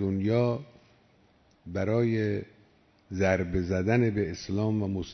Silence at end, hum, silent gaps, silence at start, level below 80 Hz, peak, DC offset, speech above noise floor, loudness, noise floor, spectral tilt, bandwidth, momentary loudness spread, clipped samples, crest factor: 0 s; none; none; 0 s; -54 dBFS; -12 dBFS; under 0.1%; 36 dB; -28 LUFS; -63 dBFS; -7.5 dB/octave; 6.4 kHz; 9 LU; under 0.1%; 16 dB